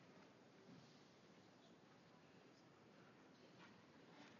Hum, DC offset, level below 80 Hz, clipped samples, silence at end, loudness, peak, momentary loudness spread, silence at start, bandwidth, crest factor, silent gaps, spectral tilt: none; under 0.1%; under -90 dBFS; under 0.1%; 0 s; -67 LUFS; -52 dBFS; 3 LU; 0 s; 7 kHz; 16 dB; none; -4 dB/octave